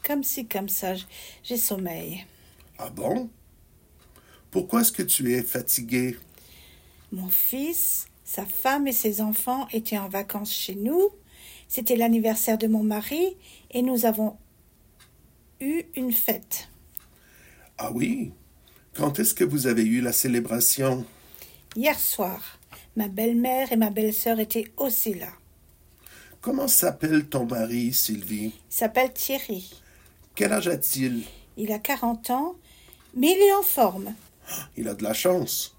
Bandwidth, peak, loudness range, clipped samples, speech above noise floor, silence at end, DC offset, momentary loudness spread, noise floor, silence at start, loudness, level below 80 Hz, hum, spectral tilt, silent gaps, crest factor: 16.5 kHz; -6 dBFS; 5 LU; under 0.1%; 33 dB; 0.1 s; under 0.1%; 15 LU; -58 dBFS; 0.05 s; -24 LUFS; -58 dBFS; none; -3.5 dB/octave; none; 22 dB